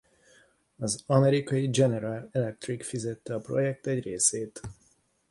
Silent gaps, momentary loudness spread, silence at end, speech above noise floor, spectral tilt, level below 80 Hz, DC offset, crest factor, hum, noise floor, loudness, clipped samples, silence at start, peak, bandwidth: none; 12 LU; 0.55 s; 39 dB; -5 dB/octave; -62 dBFS; under 0.1%; 22 dB; none; -67 dBFS; -28 LUFS; under 0.1%; 0.8 s; -8 dBFS; 11.5 kHz